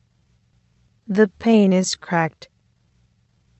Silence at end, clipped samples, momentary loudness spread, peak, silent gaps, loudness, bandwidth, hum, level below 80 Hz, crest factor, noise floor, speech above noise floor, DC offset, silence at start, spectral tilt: 1.3 s; under 0.1%; 9 LU; -2 dBFS; none; -19 LUFS; 8.6 kHz; none; -62 dBFS; 18 dB; -62 dBFS; 44 dB; under 0.1%; 1.1 s; -5.5 dB/octave